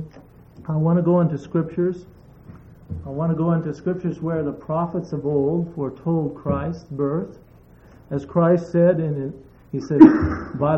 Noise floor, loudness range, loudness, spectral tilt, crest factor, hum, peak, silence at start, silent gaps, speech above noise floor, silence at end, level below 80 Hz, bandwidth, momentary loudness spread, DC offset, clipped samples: -48 dBFS; 7 LU; -21 LUFS; -10.5 dB/octave; 20 dB; none; 0 dBFS; 0 s; none; 28 dB; 0 s; -46 dBFS; 6.6 kHz; 14 LU; under 0.1%; under 0.1%